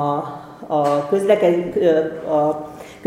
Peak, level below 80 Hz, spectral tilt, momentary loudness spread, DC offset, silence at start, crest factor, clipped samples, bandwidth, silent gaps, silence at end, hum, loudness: -2 dBFS; -58 dBFS; -7 dB/octave; 14 LU; under 0.1%; 0 s; 16 dB; under 0.1%; 15 kHz; none; 0 s; none; -19 LUFS